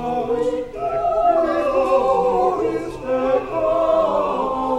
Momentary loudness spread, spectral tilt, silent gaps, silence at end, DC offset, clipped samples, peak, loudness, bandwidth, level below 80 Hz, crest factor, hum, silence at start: 6 LU; -6.5 dB/octave; none; 0 s; under 0.1%; under 0.1%; -6 dBFS; -19 LUFS; 11.5 kHz; -44 dBFS; 12 dB; none; 0 s